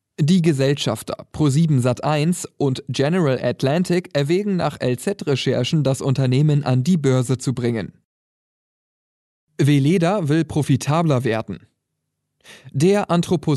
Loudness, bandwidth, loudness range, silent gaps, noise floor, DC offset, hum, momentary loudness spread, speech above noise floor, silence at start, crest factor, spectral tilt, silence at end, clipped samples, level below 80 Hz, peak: -19 LUFS; 12.5 kHz; 3 LU; 8.05-9.47 s; -77 dBFS; under 0.1%; none; 7 LU; 58 dB; 0.2 s; 14 dB; -6.5 dB/octave; 0 s; under 0.1%; -56 dBFS; -6 dBFS